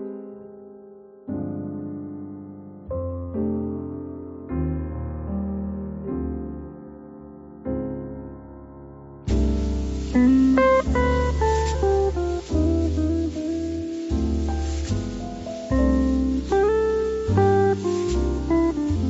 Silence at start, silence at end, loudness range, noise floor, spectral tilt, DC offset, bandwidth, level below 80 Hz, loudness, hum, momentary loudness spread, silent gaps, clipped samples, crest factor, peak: 0 s; 0 s; 11 LU; -45 dBFS; -7.5 dB/octave; under 0.1%; 8 kHz; -30 dBFS; -24 LUFS; none; 21 LU; none; under 0.1%; 16 dB; -6 dBFS